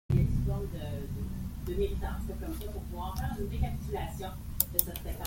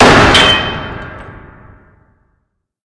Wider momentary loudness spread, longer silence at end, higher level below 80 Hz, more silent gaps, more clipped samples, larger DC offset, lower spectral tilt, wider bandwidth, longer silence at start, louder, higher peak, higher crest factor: second, 11 LU vs 24 LU; second, 0 s vs 1.5 s; second, -38 dBFS vs -28 dBFS; neither; second, under 0.1% vs 0.7%; neither; first, -6 dB/octave vs -4 dB/octave; first, 17 kHz vs 11 kHz; about the same, 0.1 s vs 0 s; second, -34 LUFS vs -8 LUFS; second, -4 dBFS vs 0 dBFS; first, 30 dB vs 12 dB